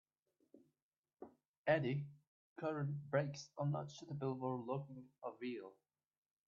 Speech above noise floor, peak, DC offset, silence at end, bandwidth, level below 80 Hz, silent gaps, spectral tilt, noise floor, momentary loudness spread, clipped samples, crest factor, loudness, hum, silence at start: over 48 dB; -22 dBFS; under 0.1%; 0.75 s; 7.4 kHz; -82 dBFS; 0.82-0.91 s, 0.98-1.03 s, 1.48-1.64 s, 2.27-2.56 s; -6.5 dB/octave; under -90 dBFS; 22 LU; under 0.1%; 22 dB; -43 LUFS; none; 0.55 s